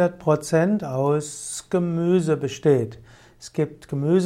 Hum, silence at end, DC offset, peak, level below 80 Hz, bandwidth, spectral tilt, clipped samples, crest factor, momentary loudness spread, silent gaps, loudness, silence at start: none; 0 s; under 0.1%; -6 dBFS; -58 dBFS; 14 kHz; -6.5 dB/octave; under 0.1%; 16 dB; 10 LU; none; -23 LUFS; 0 s